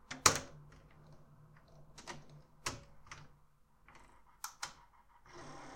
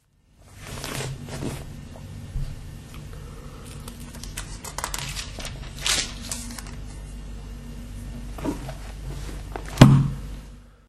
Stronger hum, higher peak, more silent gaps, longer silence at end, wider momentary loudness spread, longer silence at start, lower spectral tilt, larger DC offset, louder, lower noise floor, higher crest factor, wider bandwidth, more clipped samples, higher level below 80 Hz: neither; second, -8 dBFS vs 0 dBFS; neither; second, 0 s vs 0.15 s; first, 31 LU vs 17 LU; second, 0.05 s vs 0.4 s; second, -1 dB/octave vs -5 dB/octave; neither; second, -37 LUFS vs -26 LUFS; first, -67 dBFS vs -55 dBFS; first, 36 dB vs 26 dB; first, 16 kHz vs 13.5 kHz; neither; second, -66 dBFS vs -38 dBFS